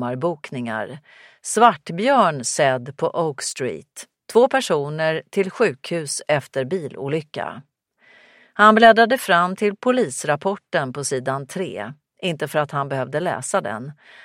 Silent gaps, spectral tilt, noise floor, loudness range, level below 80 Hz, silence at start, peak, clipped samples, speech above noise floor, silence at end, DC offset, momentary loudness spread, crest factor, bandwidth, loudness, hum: none; -4 dB/octave; -55 dBFS; 7 LU; -68 dBFS; 0 s; 0 dBFS; under 0.1%; 35 dB; 0.3 s; under 0.1%; 14 LU; 20 dB; 16 kHz; -20 LUFS; none